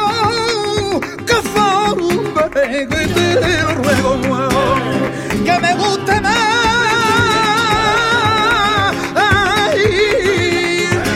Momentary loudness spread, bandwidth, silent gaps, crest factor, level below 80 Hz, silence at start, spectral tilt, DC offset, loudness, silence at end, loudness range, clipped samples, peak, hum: 4 LU; 16.5 kHz; none; 14 dB; -36 dBFS; 0 s; -4 dB/octave; under 0.1%; -14 LUFS; 0 s; 2 LU; under 0.1%; 0 dBFS; none